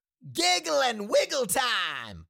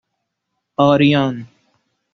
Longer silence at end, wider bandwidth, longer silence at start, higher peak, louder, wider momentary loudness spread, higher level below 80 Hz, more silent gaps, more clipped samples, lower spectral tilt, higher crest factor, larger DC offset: second, 0.05 s vs 0.7 s; first, 17 kHz vs 6.4 kHz; second, 0.25 s vs 0.8 s; second, -12 dBFS vs -2 dBFS; second, -25 LUFS vs -15 LUFS; second, 5 LU vs 16 LU; second, -62 dBFS vs -56 dBFS; neither; neither; second, -1.5 dB/octave vs -5 dB/octave; about the same, 14 dB vs 18 dB; neither